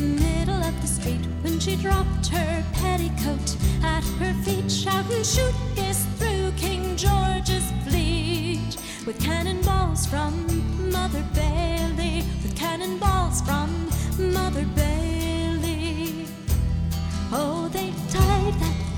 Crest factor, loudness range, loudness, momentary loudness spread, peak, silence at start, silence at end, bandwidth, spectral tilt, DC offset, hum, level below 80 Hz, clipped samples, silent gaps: 16 dB; 2 LU; -25 LUFS; 5 LU; -8 dBFS; 0 s; 0 s; 17.5 kHz; -5 dB/octave; under 0.1%; none; -28 dBFS; under 0.1%; none